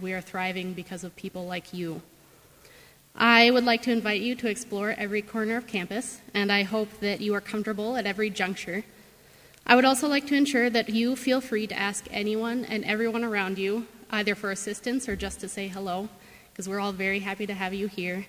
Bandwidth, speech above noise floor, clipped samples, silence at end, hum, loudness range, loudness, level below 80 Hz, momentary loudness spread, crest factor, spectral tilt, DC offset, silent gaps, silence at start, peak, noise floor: 16 kHz; 29 dB; under 0.1%; 0 s; none; 7 LU; -27 LUFS; -58 dBFS; 13 LU; 26 dB; -4 dB/octave; under 0.1%; none; 0 s; -2 dBFS; -56 dBFS